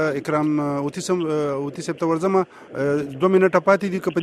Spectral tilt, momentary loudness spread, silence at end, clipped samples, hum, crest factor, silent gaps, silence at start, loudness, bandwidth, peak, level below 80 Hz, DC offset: -6.5 dB/octave; 9 LU; 0 s; under 0.1%; none; 18 dB; none; 0 s; -21 LUFS; 13 kHz; -2 dBFS; -62 dBFS; under 0.1%